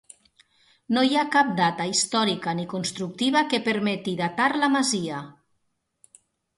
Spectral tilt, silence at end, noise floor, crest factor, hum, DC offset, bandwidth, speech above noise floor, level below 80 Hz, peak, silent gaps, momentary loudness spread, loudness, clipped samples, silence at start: -3.5 dB/octave; 1.25 s; -74 dBFS; 18 dB; none; under 0.1%; 11.5 kHz; 51 dB; -70 dBFS; -8 dBFS; none; 8 LU; -23 LUFS; under 0.1%; 0.9 s